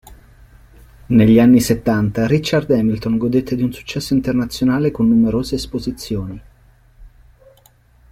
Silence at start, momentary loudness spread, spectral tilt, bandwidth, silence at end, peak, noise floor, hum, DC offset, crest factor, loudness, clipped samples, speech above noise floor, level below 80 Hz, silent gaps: 0.1 s; 13 LU; -6.5 dB/octave; 16 kHz; 1.05 s; -2 dBFS; -51 dBFS; none; under 0.1%; 16 dB; -16 LUFS; under 0.1%; 36 dB; -40 dBFS; none